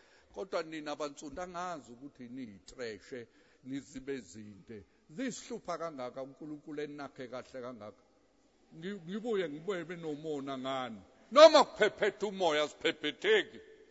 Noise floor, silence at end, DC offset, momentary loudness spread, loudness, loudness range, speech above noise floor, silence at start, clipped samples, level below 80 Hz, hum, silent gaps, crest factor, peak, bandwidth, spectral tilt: -69 dBFS; 0.2 s; under 0.1%; 20 LU; -32 LUFS; 17 LU; 36 dB; 0.35 s; under 0.1%; -72 dBFS; none; none; 28 dB; -6 dBFS; 7.6 kHz; -2 dB/octave